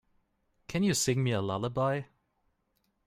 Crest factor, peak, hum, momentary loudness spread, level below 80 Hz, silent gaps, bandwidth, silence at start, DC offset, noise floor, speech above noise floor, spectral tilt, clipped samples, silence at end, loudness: 18 dB; -16 dBFS; none; 7 LU; -64 dBFS; none; 16 kHz; 0.7 s; under 0.1%; -77 dBFS; 47 dB; -5 dB/octave; under 0.1%; 1 s; -30 LUFS